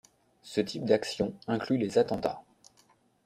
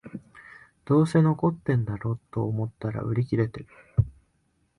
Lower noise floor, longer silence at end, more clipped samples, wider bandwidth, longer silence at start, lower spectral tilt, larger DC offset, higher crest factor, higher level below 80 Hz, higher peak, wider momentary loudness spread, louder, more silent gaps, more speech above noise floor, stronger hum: second, -66 dBFS vs -70 dBFS; first, 0.85 s vs 0.65 s; neither; first, 14.5 kHz vs 11.5 kHz; first, 0.45 s vs 0.05 s; second, -5.5 dB/octave vs -9 dB/octave; neither; about the same, 20 dB vs 18 dB; second, -64 dBFS vs -46 dBFS; about the same, -12 dBFS vs -10 dBFS; second, 7 LU vs 10 LU; second, -30 LUFS vs -26 LUFS; neither; second, 36 dB vs 45 dB; neither